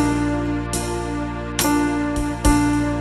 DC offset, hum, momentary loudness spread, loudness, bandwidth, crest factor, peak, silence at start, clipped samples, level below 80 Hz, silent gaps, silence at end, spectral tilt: under 0.1%; none; 7 LU; -21 LUFS; 15.5 kHz; 18 dB; -2 dBFS; 0 s; under 0.1%; -28 dBFS; none; 0 s; -5 dB/octave